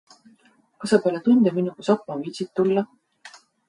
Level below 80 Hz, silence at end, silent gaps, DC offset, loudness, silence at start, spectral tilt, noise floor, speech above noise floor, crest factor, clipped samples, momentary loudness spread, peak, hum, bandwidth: -72 dBFS; 0.4 s; none; under 0.1%; -22 LUFS; 0.8 s; -6.5 dB/octave; -59 dBFS; 38 dB; 18 dB; under 0.1%; 13 LU; -6 dBFS; none; 11.5 kHz